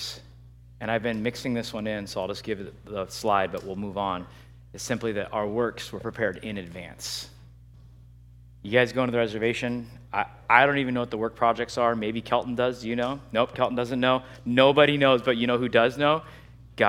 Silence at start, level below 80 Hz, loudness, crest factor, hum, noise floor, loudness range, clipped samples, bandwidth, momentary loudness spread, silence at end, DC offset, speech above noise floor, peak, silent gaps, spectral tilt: 0 s; -54 dBFS; -26 LUFS; 24 dB; 60 Hz at -50 dBFS; -50 dBFS; 9 LU; under 0.1%; 16 kHz; 15 LU; 0 s; under 0.1%; 24 dB; -2 dBFS; none; -5 dB/octave